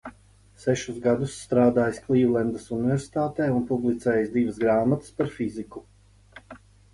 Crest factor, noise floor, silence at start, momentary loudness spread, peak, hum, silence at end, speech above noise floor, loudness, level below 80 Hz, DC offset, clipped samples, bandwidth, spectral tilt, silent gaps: 18 dB; -55 dBFS; 0.05 s; 10 LU; -8 dBFS; 50 Hz at -50 dBFS; 0.35 s; 31 dB; -25 LUFS; -54 dBFS; under 0.1%; under 0.1%; 11.5 kHz; -7 dB/octave; none